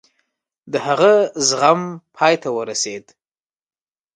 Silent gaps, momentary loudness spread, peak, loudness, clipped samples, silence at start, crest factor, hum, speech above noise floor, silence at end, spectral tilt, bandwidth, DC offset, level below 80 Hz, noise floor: none; 12 LU; 0 dBFS; -17 LUFS; under 0.1%; 0.65 s; 20 dB; none; over 73 dB; 1.15 s; -3 dB/octave; 11.5 kHz; under 0.1%; -70 dBFS; under -90 dBFS